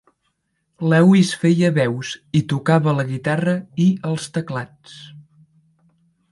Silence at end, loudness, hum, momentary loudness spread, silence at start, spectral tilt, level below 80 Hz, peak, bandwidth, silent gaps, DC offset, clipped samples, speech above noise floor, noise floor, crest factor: 1.1 s; -19 LUFS; none; 15 LU; 0.8 s; -6.5 dB/octave; -60 dBFS; -4 dBFS; 11.5 kHz; none; under 0.1%; under 0.1%; 53 dB; -71 dBFS; 16 dB